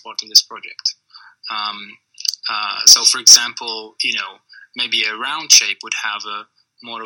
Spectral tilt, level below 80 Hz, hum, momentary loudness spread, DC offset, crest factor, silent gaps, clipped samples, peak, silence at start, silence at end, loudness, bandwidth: 3.5 dB/octave; -68 dBFS; none; 23 LU; under 0.1%; 18 dB; none; 0.4%; 0 dBFS; 0.05 s; 0 s; -13 LUFS; over 20 kHz